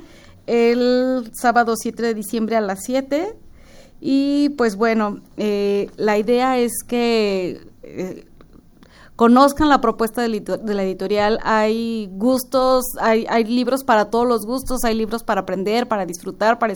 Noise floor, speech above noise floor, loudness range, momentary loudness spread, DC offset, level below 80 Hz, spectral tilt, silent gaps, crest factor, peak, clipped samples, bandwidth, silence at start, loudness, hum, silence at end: -47 dBFS; 28 dB; 3 LU; 9 LU; under 0.1%; -42 dBFS; -4.5 dB/octave; none; 18 dB; 0 dBFS; under 0.1%; over 20 kHz; 0 s; -19 LUFS; none; 0 s